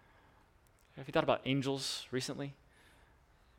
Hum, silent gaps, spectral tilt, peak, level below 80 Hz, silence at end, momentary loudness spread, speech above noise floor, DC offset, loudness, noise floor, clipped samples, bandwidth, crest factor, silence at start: none; none; -4.5 dB/octave; -14 dBFS; -66 dBFS; 1.05 s; 15 LU; 31 dB; under 0.1%; -36 LUFS; -67 dBFS; under 0.1%; 16.5 kHz; 24 dB; 0.95 s